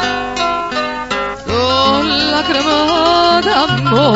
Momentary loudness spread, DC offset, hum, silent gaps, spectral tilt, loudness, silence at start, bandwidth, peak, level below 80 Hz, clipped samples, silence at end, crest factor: 8 LU; 0.3%; none; none; -4.5 dB/octave; -13 LUFS; 0 s; 8 kHz; 0 dBFS; -40 dBFS; under 0.1%; 0 s; 14 dB